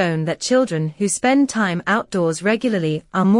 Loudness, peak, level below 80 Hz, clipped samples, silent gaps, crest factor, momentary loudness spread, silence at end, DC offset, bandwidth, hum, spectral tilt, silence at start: -19 LUFS; -4 dBFS; -60 dBFS; under 0.1%; none; 14 dB; 5 LU; 0 s; under 0.1%; 11 kHz; none; -5 dB/octave; 0 s